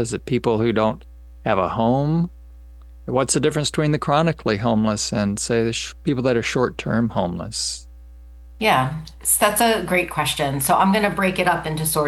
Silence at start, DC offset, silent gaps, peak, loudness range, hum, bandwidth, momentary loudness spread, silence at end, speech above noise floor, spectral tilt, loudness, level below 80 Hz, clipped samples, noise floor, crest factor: 0 s; under 0.1%; none; -2 dBFS; 4 LU; 60 Hz at -40 dBFS; 13 kHz; 8 LU; 0 s; 21 dB; -4.5 dB/octave; -20 LUFS; -42 dBFS; under 0.1%; -41 dBFS; 18 dB